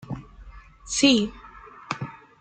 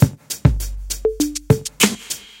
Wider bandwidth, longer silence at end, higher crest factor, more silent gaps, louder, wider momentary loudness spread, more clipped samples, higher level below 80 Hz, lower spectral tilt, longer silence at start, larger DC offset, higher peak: second, 9.2 kHz vs 17 kHz; about the same, 0.25 s vs 0.15 s; about the same, 22 dB vs 18 dB; neither; second, -23 LUFS vs -20 LUFS; first, 26 LU vs 10 LU; neither; second, -50 dBFS vs -30 dBFS; second, -3 dB/octave vs -4.5 dB/octave; about the same, 0.1 s vs 0 s; neither; second, -6 dBFS vs 0 dBFS